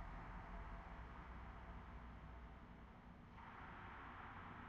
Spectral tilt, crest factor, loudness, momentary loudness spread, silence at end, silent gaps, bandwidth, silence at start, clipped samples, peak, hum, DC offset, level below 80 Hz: -5 dB/octave; 14 dB; -57 LUFS; 6 LU; 0 s; none; 7.4 kHz; 0 s; under 0.1%; -42 dBFS; none; under 0.1%; -58 dBFS